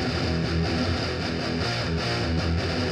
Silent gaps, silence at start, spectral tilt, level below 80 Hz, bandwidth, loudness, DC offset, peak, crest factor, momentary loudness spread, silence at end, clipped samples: none; 0 s; -5.5 dB/octave; -36 dBFS; 11 kHz; -26 LUFS; under 0.1%; -14 dBFS; 12 dB; 2 LU; 0 s; under 0.1%